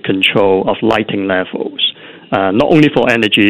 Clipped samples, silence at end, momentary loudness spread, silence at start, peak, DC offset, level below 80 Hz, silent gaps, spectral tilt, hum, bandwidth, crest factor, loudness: 0.2%; 0 s; 7 LU; 0.05 s; 0 dBFS; under 0.1%; -46 dBFS; none; -6 dB/octave; none; 15 kHz; 12 dB; -13 LUFS